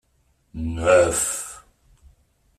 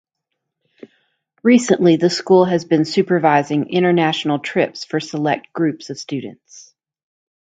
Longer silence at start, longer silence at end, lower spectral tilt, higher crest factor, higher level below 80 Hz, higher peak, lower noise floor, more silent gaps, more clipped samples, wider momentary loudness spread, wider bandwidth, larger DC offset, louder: second, 0.55 s vs 1.45 s; about the same, 1 s vs 0.95 s; second, -3.5 dB/octave vs -5.5 dB/octave; about the same, 20 dB vs 18 dB; first, -44 dBFS vs -66 dBFS; second, -4 dBFS vs 0 dBFS; second, -65 dBFS vs -78 dBFS; neither; neither; first, 19 LU vs 12 LU; first, 15 kHz vs 9.2 kHz; neither; second, -20 LUFS vs -17 LUFS